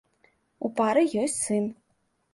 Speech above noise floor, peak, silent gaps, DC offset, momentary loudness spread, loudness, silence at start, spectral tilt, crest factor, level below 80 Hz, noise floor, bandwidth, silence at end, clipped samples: 47 dB; -10 dBFS; none; under 0.1%; 11 LU; -26 LUFS; 0.6 s; -4.5 dB/octave; 18 dB; -72 dBFS; -72 dBFS; 11.5 kHz; 0.6 s; under 0.1%